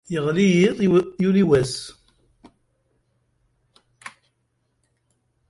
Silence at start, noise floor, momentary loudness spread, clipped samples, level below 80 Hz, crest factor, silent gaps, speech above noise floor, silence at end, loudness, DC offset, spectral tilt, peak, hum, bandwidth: 0.1 s; -71 dBFS; 25 LU; under 0.1%; -54 dBFS; 18 dB; none; 52 dB; 1.4 s; -19 LUFS; under 0.1%; -6.5 dB/octave; -4 dBFS; none; 11.5 kHz